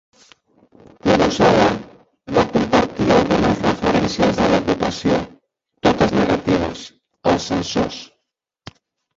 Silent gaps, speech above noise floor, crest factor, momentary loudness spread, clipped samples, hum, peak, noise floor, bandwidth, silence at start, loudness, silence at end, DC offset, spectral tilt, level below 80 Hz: none; 60 dB; 18 dB; 10 LU; under 0.1%; none; -2 dBFS; -77 dBFS; 7.8 kHz; 1.05 s; -18 LUFS; 1.15 s; under 0.1%; -5.5 dB/octave; -40 dBFS